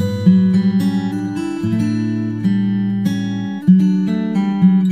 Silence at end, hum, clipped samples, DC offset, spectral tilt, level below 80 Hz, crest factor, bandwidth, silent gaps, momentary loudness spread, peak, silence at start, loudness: 0 s; none; under 0.1%; under 0.1%; -8.5 dB/octave; -56 dBFS; 14 dB; 8.8 kHz; none; 8 LU; -2 dBFS; 0 s; -16 LUFS